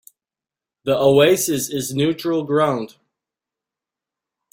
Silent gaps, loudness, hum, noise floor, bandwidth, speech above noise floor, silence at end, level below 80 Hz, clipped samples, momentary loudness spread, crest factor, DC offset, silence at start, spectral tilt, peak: none; -18 LUFS; none; -89 dBFS; 16.5 kHz; 72 dB; 1.65 s; -60 dBFS; under 0.1%; 12 LU; 18 dB; under 0.1%; 0.85 s; -4.5 dB/octave; -2 dBFS